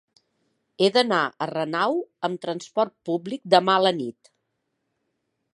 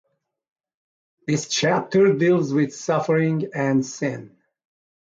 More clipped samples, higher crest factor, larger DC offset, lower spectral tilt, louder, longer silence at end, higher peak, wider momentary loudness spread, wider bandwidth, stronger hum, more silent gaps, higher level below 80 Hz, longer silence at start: neither; first, 24 dB vs 16 dB; neither; about the same, -5 dB/octave vs -5.5 dB/octave; about the same, -23 LUFS vs -21 LUFS; first, 1.45 s vs 0.9 s; first, -2 dBFS vs -8 dBFS; about the same, 11 LU vs 10 LU; first, 11.5 kHz vs 7.8 kHz; neither; neither; second, -78 dBFS vs -66 dBFS; second, 0.8 s vs 1.3 s